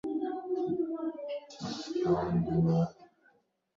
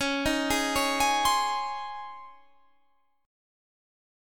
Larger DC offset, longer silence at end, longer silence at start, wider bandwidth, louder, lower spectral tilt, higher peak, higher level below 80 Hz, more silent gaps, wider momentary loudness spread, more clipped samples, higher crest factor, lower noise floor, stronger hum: second, under 0.1% vs 0.3%; second, 0.7 s vs 1 s; about the same, 0.05 s vs 0 s; second, 7.4 kHz vs 19 kHz; second, -32 LUFS vs -26 LUFS; first, -8 dB/octave vs -2 dB/octave; second, -16 dBFS vs -12 dBFS; second, -58 dBFS vs -50 dBFS; neither; second, 11 LU vs 16 LU; neither; about the same, 16 dB vs 18 dB; about the same, -69 dBFS vs -71 dBFS; neither